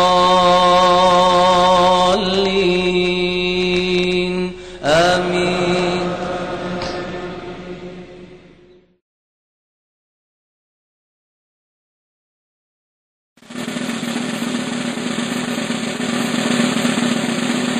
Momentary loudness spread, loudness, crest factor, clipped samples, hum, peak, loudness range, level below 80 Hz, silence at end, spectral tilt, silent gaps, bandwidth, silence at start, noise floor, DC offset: 14 LU; -16 LUFS; 16 dB; under 0.1%; none; -4 dBFS; 17 LU; -42 dBFS; 0 s; -4.5 dB/octave; 9.01-13.36 s; 15 kHz; 0 s; -49 dBFS; under 0.1%